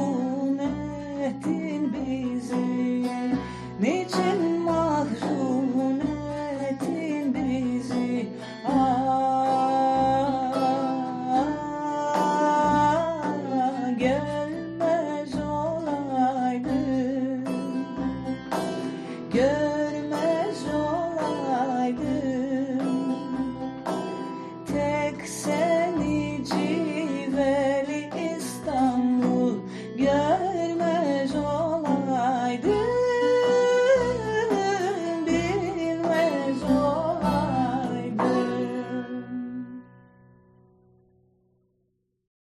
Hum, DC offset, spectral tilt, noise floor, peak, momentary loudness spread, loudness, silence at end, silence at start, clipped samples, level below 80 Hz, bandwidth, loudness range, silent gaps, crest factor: none; under 0.1%; -6 dB/octave; -73 dBFS; -10 dBFS; 8 LU; -26 LUFS; 2.55 s; 0 s; under 0.1%; -52 dBFS; 12 kHz; 5 LU; none; 14 dB